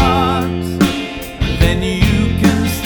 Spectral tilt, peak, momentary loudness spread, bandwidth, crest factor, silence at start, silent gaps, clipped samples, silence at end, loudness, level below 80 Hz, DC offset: -5.5 dB/octave; 0 dBFS; 7 LU; 19.5 kHz; 14 dB; 0 s; none; under 0.1%; 0 s; -15 LUFS; -22 dBFS; under 0.1%